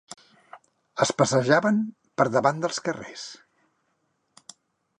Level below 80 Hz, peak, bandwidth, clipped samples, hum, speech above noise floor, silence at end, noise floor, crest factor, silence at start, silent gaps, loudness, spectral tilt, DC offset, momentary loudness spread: -70 dBFS; -4 dBFS; 11 kHz; under 0.1%; none; 50 dB; 1.65 s; -73 dBFS; 22 dB; 0.55 s; none; -24 LUFS; -4.5 dB/octave; under 0.1%; 18 LU